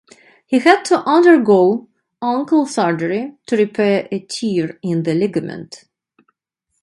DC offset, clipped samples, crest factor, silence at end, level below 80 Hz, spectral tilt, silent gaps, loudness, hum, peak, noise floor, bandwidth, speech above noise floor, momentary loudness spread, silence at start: under 0.1%; under 0.1%; 16 dB; 1.05 s; -64 dBFS; -6 dB/octave; none; -16 LUFS; none; 0 dBFS; -73 dBFS; 11.5 kHz; 58 dB; 14 LU; 0.5 s